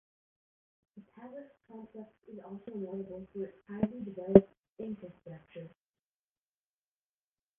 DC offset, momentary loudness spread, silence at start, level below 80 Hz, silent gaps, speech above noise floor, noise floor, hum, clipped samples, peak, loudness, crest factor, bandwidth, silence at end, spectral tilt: under 0.1%; 27 LU; 0.95 s; -62 dBFS; 4.59-4.63 s, 4.69-4.77 s; over 57 dB; under -90 dBFS; none; under 0.1%; -2 dBFS; -32 LUFS; 34 dB; 3.6 kHz; 1.9 s; -8.5 dB/octave